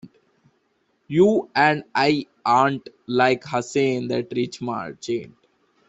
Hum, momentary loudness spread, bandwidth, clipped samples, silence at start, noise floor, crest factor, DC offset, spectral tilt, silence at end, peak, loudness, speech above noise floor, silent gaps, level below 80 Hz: none; 11 LU; 8.2 kHz; under 0.1%; 0.05 s; -68 dBFS; 20 dB; under 0.1%; -5.5 dB/octave; 0.65 s; -4 dBFS; -22 LUFS; 47 dB; none; -64 dBFS